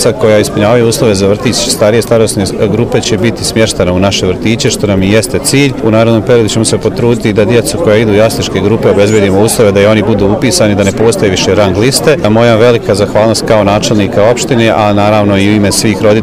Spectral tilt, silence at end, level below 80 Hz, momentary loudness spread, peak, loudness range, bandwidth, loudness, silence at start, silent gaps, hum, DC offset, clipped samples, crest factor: -5 dB/octave; 0 s; -32 dBFS; 3 LU; 0 dBFS; 2 LU; 16 kHz; -8 LUFS; 0 s; none; none; 0.6%; 1%; 8 dB